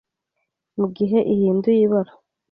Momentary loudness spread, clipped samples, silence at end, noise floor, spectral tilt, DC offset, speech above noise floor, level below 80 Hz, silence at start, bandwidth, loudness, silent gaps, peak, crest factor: 11 LU; under 0.1%; 0.45 s; -77 dBFS; -12 dB/octave; under 0.1%; 59 dB; -62 dBFS; 0.75 s; 5.4 kHz; -19 LUFS; none; -8 dBFS; 14 dB